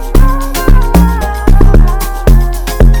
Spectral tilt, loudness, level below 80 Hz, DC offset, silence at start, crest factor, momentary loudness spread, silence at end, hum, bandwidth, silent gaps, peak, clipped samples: -6.5 dB/octave; -11 LUFS; -6 dBFS; under 0.1%; 0 s; 6 dB; 5 LU; 0 s; none; over 20 kHz; none; 0 dBFS; 0.5%